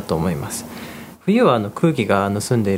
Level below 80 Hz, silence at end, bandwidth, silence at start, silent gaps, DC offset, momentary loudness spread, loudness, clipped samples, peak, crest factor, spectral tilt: -48 dBFS; 0 s; 16 kHz; 0 s; none; under 0.1%; 16 LU; -19 LUFS; under 0.1%; 0 dBFS; 18 dB; -6 dB/octave